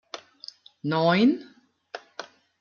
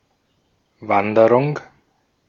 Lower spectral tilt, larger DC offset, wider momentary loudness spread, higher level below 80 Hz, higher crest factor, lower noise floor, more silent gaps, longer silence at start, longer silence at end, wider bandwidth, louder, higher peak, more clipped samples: second, -6.5 dB/octave vs -8.5 dB/octave; neither; first, 23 LU vs 17 LU; second, -74 dBFS vs -64 dBFS; about the same, 18 dB vs 20 dB; second, -48 dBFS vs -65 dBFS; neither; second, 0.15 s vs 0.8 s; second, 0.4 s vs 0.65 s; about the same, 7 kHz vs 7 kHz; second, -23 LUFS vs -17 LUFS; second, -10 dBFS vs -2 dBFS; neither